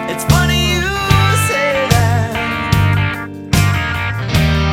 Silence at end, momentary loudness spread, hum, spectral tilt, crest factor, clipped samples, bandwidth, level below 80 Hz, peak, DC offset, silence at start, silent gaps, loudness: 0 s; 6 LU; none; -5 dB/octave; 14 dB; under 0.1%; 17 kHz; -26 dBFS; 0 dBFS; under 0.1%; 0 s; none; -14 LUFS